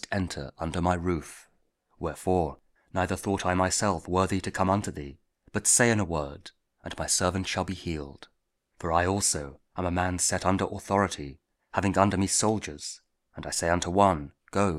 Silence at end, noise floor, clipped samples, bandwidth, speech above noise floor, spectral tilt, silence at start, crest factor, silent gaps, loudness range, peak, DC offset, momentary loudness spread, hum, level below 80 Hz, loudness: 0 s; -69 dBFS; under 0.1%; 15.5 kHz; 42 dB; -4 dB/octave; 0.1 s; 22 dB; none; 3 LU; -6 dBFS; under 0.1%; 15 LU; none; -50 dBFS; -27 LUFS